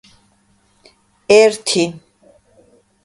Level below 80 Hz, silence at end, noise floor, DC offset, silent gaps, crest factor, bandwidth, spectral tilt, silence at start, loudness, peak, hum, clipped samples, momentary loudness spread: -60 dBFS; 1.05 s; -58 dBFS; under 0.1%; none; 18 dB; 11.5 kHz; -3 dB/octave; 1.3 s; -14 LUFS; 0 dBFS; none; under 0.1%; 13 LU